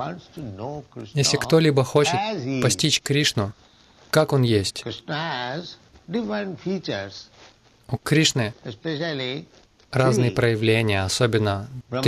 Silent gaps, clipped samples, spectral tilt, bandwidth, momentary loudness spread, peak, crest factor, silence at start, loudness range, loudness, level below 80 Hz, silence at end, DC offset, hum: none; under 0.1%; -4.5 dB/octave; 14 kHz; 14 LU; -4 dBFS; 18 dB; 0 s; 5 LU; -22 LUFS; -54 dBFS; 0 s; under 0.1%; none